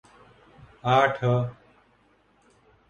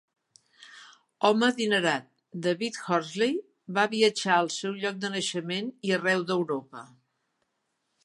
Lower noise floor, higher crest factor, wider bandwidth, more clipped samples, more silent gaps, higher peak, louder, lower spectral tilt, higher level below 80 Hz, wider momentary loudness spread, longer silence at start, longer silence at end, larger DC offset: second, -63 dBFS vs -78 dBFS; about the same, 22 dB vs 20 dB; second, 7.2 kHz vs 11.5 kHz; neither; neither; about the same, -6 dBFS vs -8 dBFS; first, -24 LUFS vs -27 LUFS; first, -7 dB/octave vs -4 dB/octave; first, -60 dBFS vs -80 dBFS; about the same, 12 LU vs 11 LU; first, 0.85 s vs 0.6 s; first, 1.35 s vs 1.2 s; neither